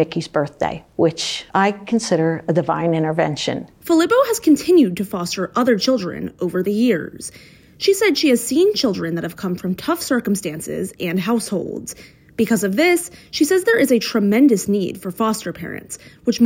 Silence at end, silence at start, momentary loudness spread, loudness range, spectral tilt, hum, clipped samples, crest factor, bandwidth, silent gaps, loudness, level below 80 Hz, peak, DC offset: 0 s; 0 s; 12 LU; 4 LU; -5 dB/octave; none; under 0.1%; 14 dB; 17 kHz; none; -19 LUFS; -56 dBFS; -4 dBFS; under 0.1%